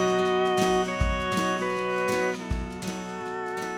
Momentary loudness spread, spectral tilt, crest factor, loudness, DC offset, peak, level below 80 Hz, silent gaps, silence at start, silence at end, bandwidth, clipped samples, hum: 10 LU; -5 dB/octave; 16 dB; -27 LUFS; under 0.1%; -12 dBFS; -38 dBFS; none; 0 s; 0 s; 17 kHz; under 0.1%; none